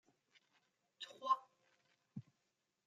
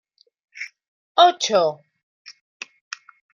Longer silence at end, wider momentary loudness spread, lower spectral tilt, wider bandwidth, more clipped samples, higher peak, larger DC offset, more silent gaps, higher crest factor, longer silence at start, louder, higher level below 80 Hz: second, 0.65 s vs 1.05 s; second, 17 LU vs 23 LU; first, -4.5 dB/octave vs -2 dB/octave; about the same, 7.8 kHz vs 7.2 kHz; neither; second, -24 dBFS vs -2 dBFS; neither; second, none vs 0.88-1.15 s, 2.03-2.25 s; about the same, 26 dB vs 22 dB; first, 1 s vs 0.55 s; second, -41 LUFS vs -18 LUFS; second, under -90 dBFS vs -78 dBFS